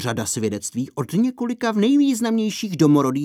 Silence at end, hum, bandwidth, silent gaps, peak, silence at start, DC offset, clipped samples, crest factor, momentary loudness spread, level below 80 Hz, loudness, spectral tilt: 0 s; none; 15.5 kHz; none; -4 dBFS; 0 s; under 0.1%; under 0.1%; 16 dB; 8 LU; -62 dBFS; -20 LUFS; -5.5 dB/octave